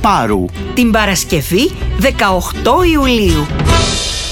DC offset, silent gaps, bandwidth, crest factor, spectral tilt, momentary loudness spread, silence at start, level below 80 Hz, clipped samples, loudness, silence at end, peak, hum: under 0.1%; none; 19.5 kHz; 12 dB; -4.5 dB/octave; 5 LU; 0 s; -20 dBFS; under 0.1%; -12 LUFS; 0 s; 0 dBFS; none